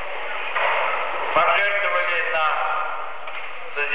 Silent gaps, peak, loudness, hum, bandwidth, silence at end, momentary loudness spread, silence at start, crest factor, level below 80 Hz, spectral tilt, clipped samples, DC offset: none; -8 dBFS; -22 LUFS; none; 4 kHz; 0 s; 13 LU; 0 s; 16 dB; -66 dBFS; -5 dB/octave; under 0.1%; 4%